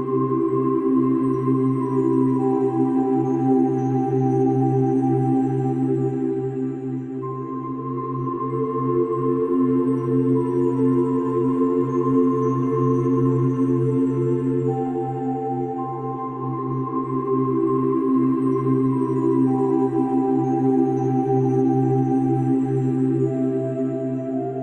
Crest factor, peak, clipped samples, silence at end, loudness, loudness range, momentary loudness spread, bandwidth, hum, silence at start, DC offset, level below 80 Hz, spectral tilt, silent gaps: 12 dB; -8 dBFS; under 0.1%; 0 s; -21 LUFS; 4 LU; 7 LU; 6.4 kHz; none; 0 s; under 0.1%; -58 dBFS; -11 dB/octave; none